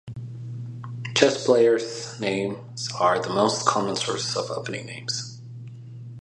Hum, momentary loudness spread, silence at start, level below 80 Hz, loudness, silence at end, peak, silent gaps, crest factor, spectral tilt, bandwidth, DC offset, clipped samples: none; 19 LU; 0.05 s; -64 dBFS; -24 LUFS; 0 s; -2 dBFS; none; 24 dB; -4 dB/octave; 11.5 kHz; under 0.1%; under 0.1%